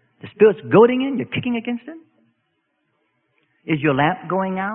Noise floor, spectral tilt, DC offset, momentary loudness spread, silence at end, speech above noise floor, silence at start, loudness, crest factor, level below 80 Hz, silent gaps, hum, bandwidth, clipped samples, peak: -70 dBFS; -11.5 dB/octave; under 0.1%; 15 LU; 0 s; 52 dB; 0.25 s; -19 LUFS; 20 dB; -60 dBFS; none; none; 3.8 kHz; under 0.1%; 0 dBFS